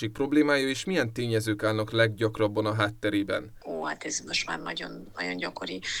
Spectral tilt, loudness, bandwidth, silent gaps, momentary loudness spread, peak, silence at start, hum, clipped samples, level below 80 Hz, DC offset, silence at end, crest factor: -4.5 dB/octave; -28 LUFS; 15.5 kHz; none; 10 LU; -10 dBFS; 0 s; none; under 0.1%; -58 dBFS; under 0.1%; 0 s; 18 dB